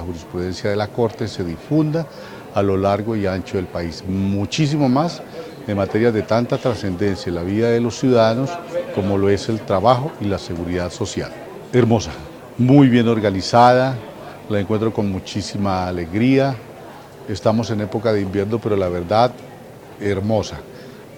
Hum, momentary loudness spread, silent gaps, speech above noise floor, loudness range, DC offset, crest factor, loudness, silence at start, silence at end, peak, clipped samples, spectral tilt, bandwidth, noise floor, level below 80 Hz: none; 16 LU; none; 20 dB; 5 LU; under 0.1%; 18 dB; -19 LUFS; 0 s; 0 s; 0 dBFS; under 0.1%; -6.5 dB/octave; 16.5 kHz; -38 dBFS; -50 dBFS